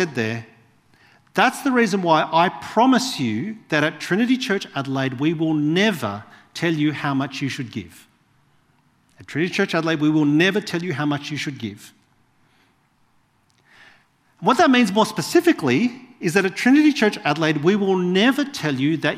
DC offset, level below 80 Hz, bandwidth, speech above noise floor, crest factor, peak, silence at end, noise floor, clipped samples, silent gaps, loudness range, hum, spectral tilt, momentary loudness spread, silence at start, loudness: under 0.1%; -66 dBFS; 15.5 kHz; 42 dB; 20 dB; -2 dBFS; 0 s; -62 dBFS; under 0.1%; none; 8 LU; none; -5 dB/octave; 11 LU; 0 s; -20 LUFS